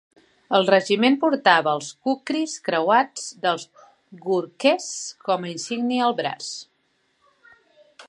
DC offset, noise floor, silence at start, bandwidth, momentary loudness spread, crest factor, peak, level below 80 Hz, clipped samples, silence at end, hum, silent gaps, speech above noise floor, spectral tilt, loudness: under 0.1%; -68 dBFS; 0.5 s; 11.5 kHz; 12 LU; 22 dB; -2 dBFS; -80 dBFS; under 0.1%; 0.05 s; none; none; 46 dB; -3.5 dB/octave; -22 LUFS